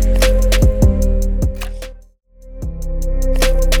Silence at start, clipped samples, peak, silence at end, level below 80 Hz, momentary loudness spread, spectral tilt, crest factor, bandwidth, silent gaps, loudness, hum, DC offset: 0 s; under 0.1%; -2 dBFS; 0 s; -16 dBFS; 15 LU; -5 dB/octave; 12 dB; 17.5 kHz; none; -17 LUFS; none; under 0.1%